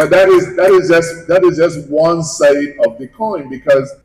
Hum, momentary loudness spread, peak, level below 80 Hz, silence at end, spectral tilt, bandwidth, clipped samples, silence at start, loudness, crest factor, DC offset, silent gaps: none; 11 LU; -4 dBFS; -48 dBFS; 0.1 s; -5 dB/octave; 14 kHz; under 0.1%; 0 s; -12 LUFS; 8 dB; under 0.1%; none